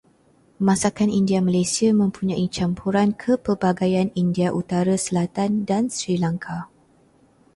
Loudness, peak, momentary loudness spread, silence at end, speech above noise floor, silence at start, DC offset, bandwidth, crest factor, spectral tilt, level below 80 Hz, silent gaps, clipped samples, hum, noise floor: -21 LUFS; -4 dBFS; 5 LU; 0.9 s; 37 dB; 0.6 s; under 0.1%; 11.5 kHz; 18 dB; -6 dB/octave; -54 dBFS; none; under 0.1%; none; -58 dBFS